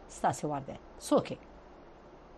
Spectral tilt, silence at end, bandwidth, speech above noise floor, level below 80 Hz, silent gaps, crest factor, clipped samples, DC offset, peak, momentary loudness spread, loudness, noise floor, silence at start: -5.5 dB/octave; 0 s; 12.5 kHz; 20 dB; -58 dBFS; none; 20 dB; under 0.1%; under 0.1%; -14 dBFS; 24 LU; -33 LUFS; -53 dBFS; 0 s